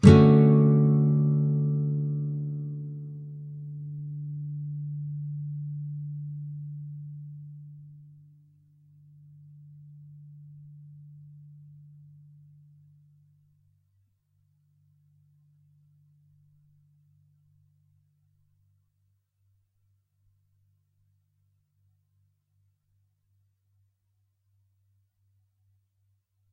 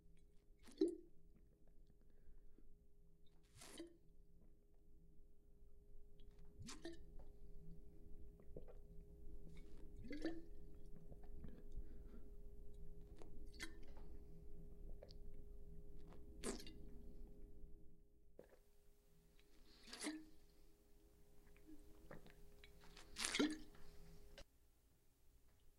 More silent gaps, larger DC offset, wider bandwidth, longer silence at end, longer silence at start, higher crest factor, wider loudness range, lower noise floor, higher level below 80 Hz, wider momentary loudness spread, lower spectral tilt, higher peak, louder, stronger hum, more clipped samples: neither; neither; second, 8.8 kHz vs 15.5 kHz; first, 15.4 s vs 0.05 s; about the same, 0.05 s vs 0 s; second, 28 dB vs 34 dB; first, 26 LU vs 16 LU; about the same, -74 dBFS vs -74 dBFS; first, -54 dBFS vs -60 dBFS; first, 30 LU vs 21 LU; first, -9.5 dB/octave vs -3.5 dB/octave; first, -2 dBFS vs -20 dBFS; first, -26 LUFS vs -53 LUFS; neither; neither